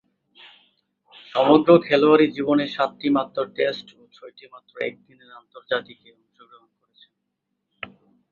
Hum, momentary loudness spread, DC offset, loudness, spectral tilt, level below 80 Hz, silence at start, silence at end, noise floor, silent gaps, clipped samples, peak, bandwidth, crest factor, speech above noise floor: none; 21 LU; under 0.1%; -20 LUFS; -7.5 dB/octave; -68 dBFS; 1.35 s; 2.5 s; -78 dBFS; none; under 0.1%; -2 dBFS; 7 kHz; 22 dB; 57 dB